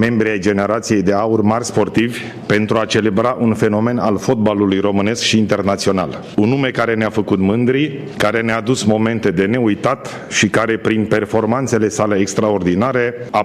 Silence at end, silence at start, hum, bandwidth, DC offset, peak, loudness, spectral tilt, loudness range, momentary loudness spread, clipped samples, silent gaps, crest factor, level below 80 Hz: 0 s; 0 s; none; 13.5 kHz; under 0.1%; 0 dBFS; -16 LUFS; -5.5 dB/octave; 1 LU; 3 LU; under 0.1%; none; 16 dB; -48 dBFS